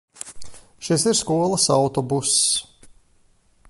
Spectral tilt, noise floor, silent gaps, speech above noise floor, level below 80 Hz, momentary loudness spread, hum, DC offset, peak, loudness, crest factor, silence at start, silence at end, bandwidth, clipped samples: -3.5 dB/octave; -58 dBFS; none; 38 dB; -54 dBFS; 19 LU; none; under 0.1%; -6 dBFS; -19 LUFS; 18 dB; 0.25 s; 1.05 s; 12 kHz; under 0.1%